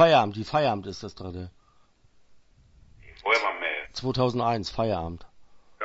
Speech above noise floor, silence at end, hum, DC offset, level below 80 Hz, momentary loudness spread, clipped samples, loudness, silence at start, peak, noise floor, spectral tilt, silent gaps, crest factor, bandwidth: 34 dB; 0 s; none; under 0.1%; -54 dBFS; 15 LU; under 0.1%; -27 LUFS; 0 s; -6 dBFS; -60 dBFS; -5.5 dB/octave; none; 22 dB; 8 kHz